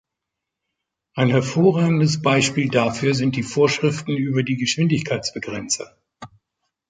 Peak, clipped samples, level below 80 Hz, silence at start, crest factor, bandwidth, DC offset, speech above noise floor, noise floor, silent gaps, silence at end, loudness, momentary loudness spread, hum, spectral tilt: -4 dBFS; under 0.1%; -56 dBFS; 1.15 s; 18 dB; 9.4 kHz; under 0.1%; 63 dB; -83 dBFS; none; 0.65 s; -20 LUFS; 8 LU; none; -5 dB/octave